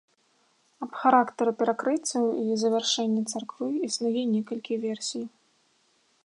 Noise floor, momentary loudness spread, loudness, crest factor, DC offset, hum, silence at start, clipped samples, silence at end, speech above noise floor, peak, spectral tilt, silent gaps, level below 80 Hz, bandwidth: -67 dBFS; 11 LU; -27 LUFS; 22 dB; under 0.1%; none; 0.8 s; under 0.1%; 0.95 s; 41 dB; -6 dBFS; -3.5 dB/octave; none; -84 dBFS; 11.5 kHz